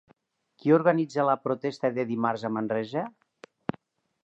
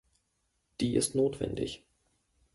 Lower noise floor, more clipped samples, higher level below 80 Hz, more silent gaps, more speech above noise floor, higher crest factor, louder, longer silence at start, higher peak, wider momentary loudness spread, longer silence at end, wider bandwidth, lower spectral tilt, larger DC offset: second, -65 dBFS vs -78 dBFS; neither; second, -74 dBFS vs -58 dBFS; neither; second, 40 dB vs 47 dB; about the same, 20 dB vs 18 dB; first, -27 LUFS vs -31 LUFS; second, 0.65 s vs 0.8 s; first, -8 dBFS vs -16 dBFS; about the same, 15 LU vs 17 LU; first, 1.15 s vs 0.8 s; second, 8.2 kHz vs 12 kHz; first, -7.5 dB/octave vs -5 dB/octave; neither